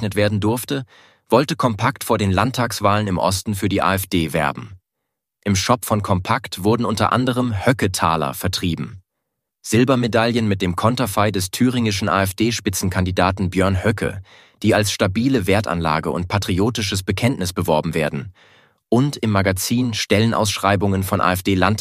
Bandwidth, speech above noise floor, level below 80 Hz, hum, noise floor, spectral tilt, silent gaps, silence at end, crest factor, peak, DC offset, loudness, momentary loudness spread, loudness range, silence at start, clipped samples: 15.5 kHz; 61 dB; -46 dBFS; none; -79 dBFS; -5 dB/octave; none; 0 s; 18 dB; 0 dBFS; under 0.1%; -19 LUFS; 5 LU; 2 LU; 0 s; under 0.1%